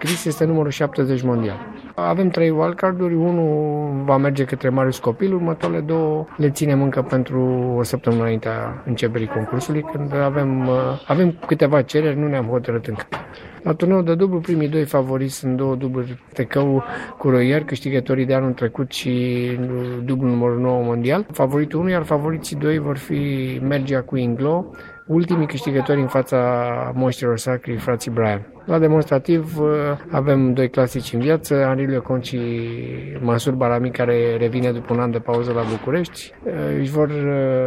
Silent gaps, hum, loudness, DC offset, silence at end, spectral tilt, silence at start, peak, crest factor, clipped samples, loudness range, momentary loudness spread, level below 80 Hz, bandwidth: none; none; -20 LUFS; under 0.1%; 0 s; -7 dB/octave; 0 s; -2 dBFS; 18 dB; under 0.1%; 2 LU; 7 LU; -52 dBFS; 16 kHz